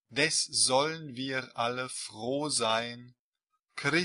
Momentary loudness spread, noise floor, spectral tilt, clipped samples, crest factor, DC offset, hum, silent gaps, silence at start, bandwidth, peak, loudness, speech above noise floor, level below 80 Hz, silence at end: 12 LU; -83 dBFS; -2 dB/octave; under 0.1%; 22 dB; under 0.1%; none; 3.19-3.32 s; 0.1 s; 11.5 kHz; -10 dBFS; -29 LUFS; 53 dB; -74 dBFS; 0 s